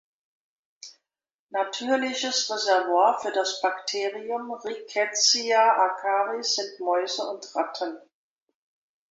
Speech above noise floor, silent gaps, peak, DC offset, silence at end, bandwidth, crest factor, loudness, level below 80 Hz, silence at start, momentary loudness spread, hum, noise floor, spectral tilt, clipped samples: over 65 dB; 1.34-1.49 s; -8 dBFS; under 0.1%; 1.1 s; 8 kHz; 18 dB; -25 LUFS; -80 dBFS; 0.85 s; 13 LU; none; under -90 dBFS; 0.5 dB/octave; under 0.1%